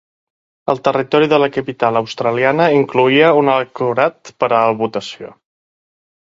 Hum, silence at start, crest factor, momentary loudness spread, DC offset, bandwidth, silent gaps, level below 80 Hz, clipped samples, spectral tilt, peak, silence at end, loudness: none; 0.65 s; 16 dB; 10 LU; under 0.1%; 7.6 kHz; none; -60 dBFS; under 0.1%; -6 dB/octave; 0 dBFS; 1.05 s; -15 LUFS